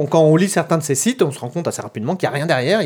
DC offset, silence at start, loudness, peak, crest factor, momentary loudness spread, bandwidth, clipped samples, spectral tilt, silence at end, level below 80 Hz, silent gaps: under 0.1%; 0 s; -18 LUFS; -2 dBFS; 16 dB; 10 LU; 19.5 kHz; under 0.1%; -5 dB/octave; 0 s; -70 dBFS; none